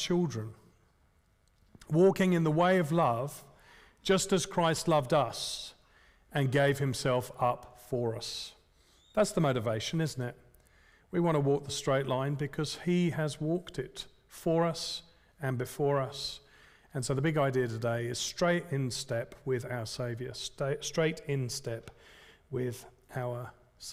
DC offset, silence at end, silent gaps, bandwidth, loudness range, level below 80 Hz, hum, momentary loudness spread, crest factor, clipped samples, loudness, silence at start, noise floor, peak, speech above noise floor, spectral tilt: under 0.1%; 0 s; none; 16 kHz; 5 LU; -60 dBFS; none; 13 LU; 16 dB; under 0.1%; -32 LUFS; 0 s; -68 dBFS; -16 dBFS; 37 dB; -5.5 dB/octave